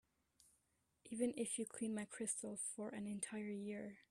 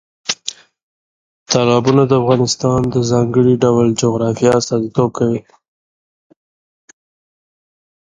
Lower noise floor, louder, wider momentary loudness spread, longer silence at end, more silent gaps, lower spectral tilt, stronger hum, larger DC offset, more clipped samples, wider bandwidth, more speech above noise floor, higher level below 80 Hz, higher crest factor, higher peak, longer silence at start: second, -83 dBFS vs under -90 dBFS; second, -45 LUFS vs -15 LUFS; second, 6 LU vs 9 LU; second, 0.1 s vs 2.7 s; second, none vs 0.83-1.46 s; second, -4 dB/octave vs -5.5 dB/octave; neither; neither; neither; first, 14 kHz vs 9.6 kHz; second, 38 dB vs over 77 dB; second, -84 dBFS vs -48 dBFS; about the same, 18 dB vs 16 dB; second, -28 dBFS vs 0 dBFS; first, 1.05 s vs 0.3 s